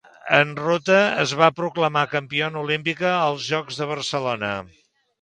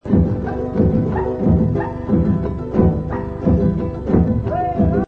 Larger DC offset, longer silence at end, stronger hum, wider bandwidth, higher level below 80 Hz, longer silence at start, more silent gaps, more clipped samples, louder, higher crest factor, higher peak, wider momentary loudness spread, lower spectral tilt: neither; first, 0.55 s vs 0 s; neither; first, 10 kHz vs 4.9 kHz; second, -64 dBFS vs -28 dBFS; first, 0.25 s vs 0.05 s; neither; neither; second, -21 LUFS vs -18 LUFS; first, 22 dB vs 16 dB; about the same, 0 dBFS vs -2 dBFS; about the same, 8 LU vs 6 LU; second, -4.5 dB/octave vs -11.5 dB/octave